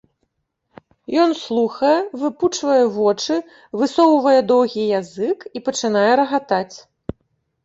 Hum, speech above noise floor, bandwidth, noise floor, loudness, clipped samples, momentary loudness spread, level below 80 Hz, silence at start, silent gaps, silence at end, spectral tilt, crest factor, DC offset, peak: none; 54 dB; 8 kHz; -72 dBFS; -18 LUFS; under 0.1%; 10 LU; -54 dBFS; 1.1 s; none; 0.85 s; -4.5 dB/octave; 16 dB; under 0.1%; -2 dBFS